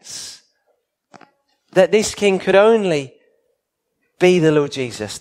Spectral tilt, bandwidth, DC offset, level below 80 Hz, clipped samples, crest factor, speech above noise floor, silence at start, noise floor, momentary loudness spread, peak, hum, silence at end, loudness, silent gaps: -5 dB/octave; 15.5 kHz; under 0.1%; -56 dBFS; under 0.1%; 18 dB; 58 dB; 0.05 s; -73 dBFS; 18 LU; 0 dBFS; none; 0 s; -16 LUFS; none